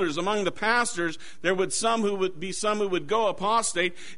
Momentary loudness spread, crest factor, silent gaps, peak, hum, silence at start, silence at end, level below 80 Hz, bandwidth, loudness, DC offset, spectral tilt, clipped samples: 5 LU; 16 dB; none; -10 dBFS; none; 0 s; 0.05 s; -58 dBFS; 11 kHz; -26 LUFS; 1%; -3 dB/octave; under 0.1%